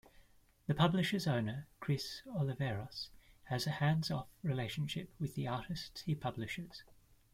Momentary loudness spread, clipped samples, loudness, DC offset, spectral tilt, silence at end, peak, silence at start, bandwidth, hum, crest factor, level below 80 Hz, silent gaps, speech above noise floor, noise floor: 12 LU; under 0.1%; -38 LUFS; under 0.1%; -6 dB/octave; 0.5 s; -16 dBFS; 0.2 s; 16 kHz; none; 22 dB; -64 dBFS; none; 28 dB; -65 dBFS